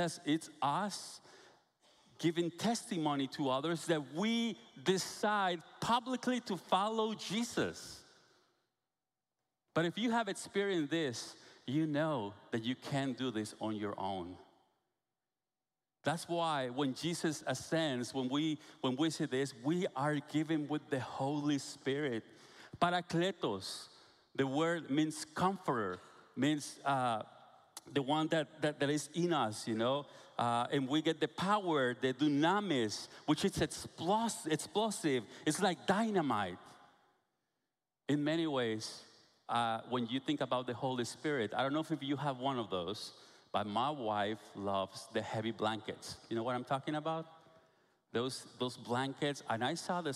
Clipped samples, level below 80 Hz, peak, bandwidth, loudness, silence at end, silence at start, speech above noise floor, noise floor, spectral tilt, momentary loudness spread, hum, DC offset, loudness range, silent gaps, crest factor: under 0.1%; -74 dBFS; -16 dBFS; 14.5 kHz; -36 LUFS; 0 s; 0 s; over 54 dB; under -90 dBFS; -5 dB/octave; 8 LU; none; under 0.1%; 5 LU; none; 22 dB